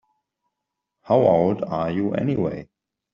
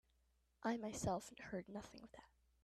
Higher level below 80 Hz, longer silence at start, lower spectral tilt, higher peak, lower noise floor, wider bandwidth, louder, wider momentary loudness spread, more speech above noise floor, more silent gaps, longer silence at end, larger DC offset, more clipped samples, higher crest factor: first, -58 dBFS vs -68 dBFS; first, 1.05 s vs 0.6 s; first, -8 dB/octave vs -5 dB/octave; first, -4 dBFS vs -30 dBFS; about the same, -82 dBFS vs -80 dBFS; second, 7 kHz vs 13.5 kHz; first, -21 LUFS vs -46 LUFS; second, 9 LU vs 17 LU; first, 62 dB vs 33 dB; neither; about the same, 0.5 s vs 0.4 s; neither; neither; about the same, 18 dB vs 18 dB